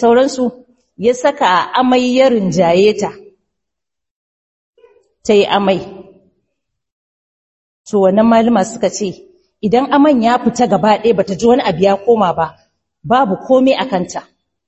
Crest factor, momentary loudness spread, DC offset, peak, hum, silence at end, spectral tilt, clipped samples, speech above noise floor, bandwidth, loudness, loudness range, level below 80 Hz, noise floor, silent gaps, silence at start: 14 dB; 10 LU; under 0.1%; 0 dBFS; none; 0.45 s; -5.5 dB/octave; under 0.1%; 70 dB; 8.4 kHz; -13 LUFS; 6 LU; -50 dBFS; -82 dBFS; 4.11-4.73 s, 6.92-7.84 s; 0 s